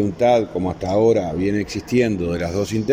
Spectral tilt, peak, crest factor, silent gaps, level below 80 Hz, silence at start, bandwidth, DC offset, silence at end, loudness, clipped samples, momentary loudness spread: -6.5 dB/octave; -6 dBFS; 14 dB; none; -44 dBFS; 0 s; 16 kHz; under 0.1%; 0 s; -20 LUFS; under 0.1%; 7 LU